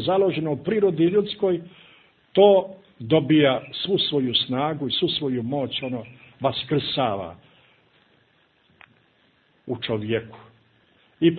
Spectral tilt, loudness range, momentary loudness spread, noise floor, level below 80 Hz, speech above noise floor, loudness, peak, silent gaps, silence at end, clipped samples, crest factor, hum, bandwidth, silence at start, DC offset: -10.5 dB/octave; 13 LU; 13 LU; -62 dBFS; -62 dBFS; 40 dB; -22 LUFS; -4 dBFS; none; 0 s; under 0.1%; 20 dB; none; 4.7 kHz; 0 s; under 0.1%